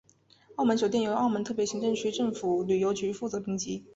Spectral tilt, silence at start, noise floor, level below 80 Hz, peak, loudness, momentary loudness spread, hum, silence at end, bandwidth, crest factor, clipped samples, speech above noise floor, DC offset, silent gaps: -5 dB/octave; 0.5 s; -59 dBFS; -66 dBFS; -12 dBFS; -29 LUFS; 6 LU; none; 0.1 s; 8 kHz; 16 dB; under 0.1%; 31 dB; under 0.1%; none